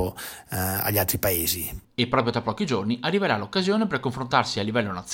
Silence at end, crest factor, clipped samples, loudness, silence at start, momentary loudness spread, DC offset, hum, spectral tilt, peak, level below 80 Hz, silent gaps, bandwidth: 0 s; 20 dB; under 0.1%; -25 LUFS; 0 s; 6 LU; under 0.1%; none; -4.5 dB/octave; -6 dBFS; -50 dBFS; none; 17 kHz